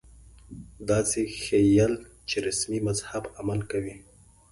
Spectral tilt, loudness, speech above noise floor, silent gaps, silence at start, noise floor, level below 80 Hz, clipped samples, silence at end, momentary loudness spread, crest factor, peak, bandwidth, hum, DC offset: -5 dB/octave; -27 LUFS; 25 dB; none; 0.5 s; -51 dBFS; -50 dBFS; under 0.1%; 0.5 s; 17 LU; 18 dB; -10 dBFS; 11.5 kHz; none; under 0.1%